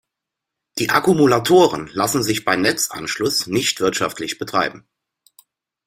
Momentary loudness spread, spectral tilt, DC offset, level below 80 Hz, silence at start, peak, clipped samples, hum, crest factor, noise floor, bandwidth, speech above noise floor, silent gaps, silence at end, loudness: 9 LU; -3.5 dB/octave; under 0.1%; -56 dBFS; 0.75 s; 0 dBFS; under 0.1%; none; 18 dB; -83 dBFS; 16.5 kHz; 65 dB; none; 1.1 s; -18 LUFS